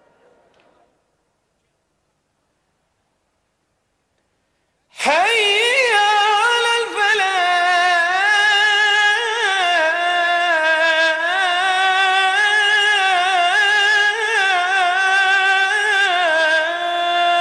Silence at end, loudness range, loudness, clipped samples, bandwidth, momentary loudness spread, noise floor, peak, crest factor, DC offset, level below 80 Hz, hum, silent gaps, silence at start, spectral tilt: 0 s; 3 LU; -15 LUFS; under 0.1%; 13.5 kHz; 4 LU; -68 dBFS; -4 dBFS; 12 dB; under 0.1%; -68 dBFS; none; none; 4.95 s; 1 dB/octave